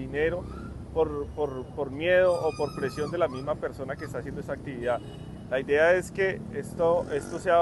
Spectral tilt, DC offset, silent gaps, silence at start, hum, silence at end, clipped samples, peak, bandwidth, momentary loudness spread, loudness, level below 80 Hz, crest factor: -6 dB/octave; under 0.1%; none; 0 s; none; 0 s; under 0.1%; -12 dBFS; 12.5 kHz; 13 LU; -28 LUFS; -48 dBFS; 16 dB